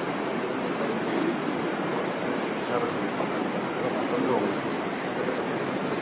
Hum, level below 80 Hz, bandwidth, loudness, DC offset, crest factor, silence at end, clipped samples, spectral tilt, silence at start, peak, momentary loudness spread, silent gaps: none; -64 dBFS; 4 kHz; -28 LUFS; under 0.1%; 18 dB; 0 s; under 0.1%; -4.5 dB/octave; 0 s; -10 dBFS; 3 LU; none